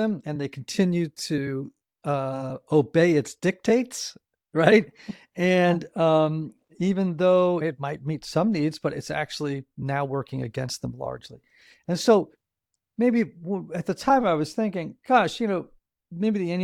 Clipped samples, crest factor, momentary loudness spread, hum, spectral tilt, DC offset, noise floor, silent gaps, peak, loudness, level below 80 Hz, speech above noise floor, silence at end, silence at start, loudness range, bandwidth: under 0.1%; 22 dB; 13 LU; none; -6 dB/octave; under 0.1%; -83 dBFS; none; -2 dBFS; -25 LUFS; -62 dBFS; 59 dB; 0 s; 0 s; 5 LU; 15 kHz